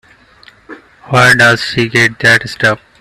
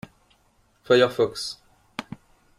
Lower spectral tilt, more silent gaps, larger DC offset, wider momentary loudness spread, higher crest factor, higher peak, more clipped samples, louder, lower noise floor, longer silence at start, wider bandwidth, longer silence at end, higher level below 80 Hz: about the same, -4 dB/octave vs -4.5 dB/octave; neither; neither; second, 7 LU vs 24 LU; second, 12 dB vs 22 dB; first, 0 dBFS vs -6 dBFS; first, 0.1% vs under 0.1%; first, -9 LUFS vs -22 LUFS; second, -43 dBFS vs -63 dBFS; second, 0.7 s vs 0.9 s; about the same, 15 kHz vs 14.5 kHz; second, 0.25 s vs 0.55 s; first, -46 dBFS vs -62 dBFS